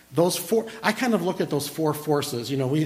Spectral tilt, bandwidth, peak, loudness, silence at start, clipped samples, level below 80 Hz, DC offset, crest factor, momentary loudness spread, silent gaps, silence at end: -5 dB/octave; 16 kHz; -6 dBFS; -25 LUFS; 0.1 s; under 0.1%; -64 dBFS; under 0.1%; 18 dB; 4 LU; none; 0 s